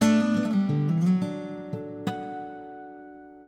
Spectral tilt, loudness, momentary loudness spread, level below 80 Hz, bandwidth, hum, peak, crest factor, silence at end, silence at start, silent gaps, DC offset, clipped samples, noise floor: -7 dB/octave; -27 LUFS; 20 LU; -66 dBFS; 13 kHz; none; -12 dBFS; 16 dB; 0.05 s; 0 s; none; under 0.1%; under 0.1%; -46 dBFS